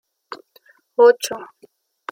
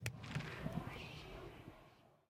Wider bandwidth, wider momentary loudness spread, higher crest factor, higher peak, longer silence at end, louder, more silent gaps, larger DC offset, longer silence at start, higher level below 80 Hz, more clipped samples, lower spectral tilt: about the same, 16.5 kHz vs 16.5 kHz; first, 24 LU vs 15 LU; second, 18 dB vs 24 dB; first, -2 dBFS vs -24 dBFS; first, 0.65 s vs 0.15 s; first, -17 LUFS vs -48 LUFS; neither; neither; first, 0.3 s vs 0 s; second, -74 dBFS vs -62 dBFS; neither; second, -1.5 dB/octave vs -5.5 dB/octave